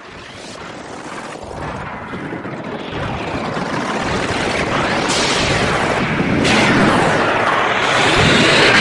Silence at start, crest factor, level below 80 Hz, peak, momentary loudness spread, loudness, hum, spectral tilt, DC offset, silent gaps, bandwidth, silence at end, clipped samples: 0 s; 16 dB; -38 dBFS; -2 dBFS; 18 LU; -15 LUFS; none; -4 dB/octave; under 0.1%; none; 11.5 kHz; 0 s; under 0.1%